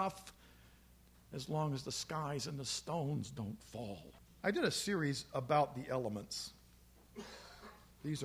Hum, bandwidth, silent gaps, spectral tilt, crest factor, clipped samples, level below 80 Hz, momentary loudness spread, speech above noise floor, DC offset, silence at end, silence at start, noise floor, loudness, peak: none; 20 kHz; none; -4.5 dB/octave; 20 dB; under 0.1%; -66 dBFS; 19 LU; 25 dB; under 0.1%; 0 s; 0 s; -64 dBFS; -40 LUFS; -20 dBFS